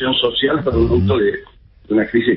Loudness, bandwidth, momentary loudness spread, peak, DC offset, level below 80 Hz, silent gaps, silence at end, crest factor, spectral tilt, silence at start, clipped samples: -16 LUFS; 5.6 kHz; 5 LU; -2 dBFS; under 0.1%; -32 dBFS; none; 0 s; 14 dB; -11.5 dB/octave; 0 s; under 0.1%